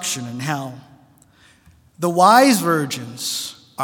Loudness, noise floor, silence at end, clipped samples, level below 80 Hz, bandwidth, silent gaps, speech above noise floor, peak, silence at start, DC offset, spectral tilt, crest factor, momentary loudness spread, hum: -18 LUFS; -53 dBFS; 0 s; under 0.1%; -66 dBFS; 18 kHz; none; 35 dB; 0 dBFS; 0 s; under 0.1%; -4 dB/octave; 20 dB; 15 LU; none